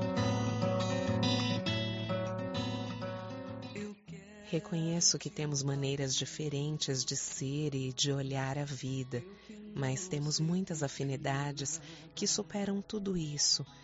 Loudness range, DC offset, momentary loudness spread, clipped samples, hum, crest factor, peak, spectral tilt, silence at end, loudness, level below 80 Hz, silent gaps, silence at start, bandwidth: 3 LU; under 0.1%; 12 LU; under 0.1%; none; 20 dB; -14 dBFS; -5 dB/octave; 0 s; -34 LUFS; -64 dBFS; none; 0 s; 8 kHz